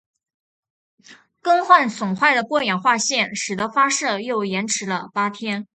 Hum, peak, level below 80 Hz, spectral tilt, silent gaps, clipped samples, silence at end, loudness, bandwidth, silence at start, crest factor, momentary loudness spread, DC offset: none; 0 dBFS; -68 dBFS; -2.5 dB/octave; none; under 0.1%; 0.1 s; -19 LUFS; 9.4 kHz; 1.1 s; 22 dB; 9 LU; under 0.1%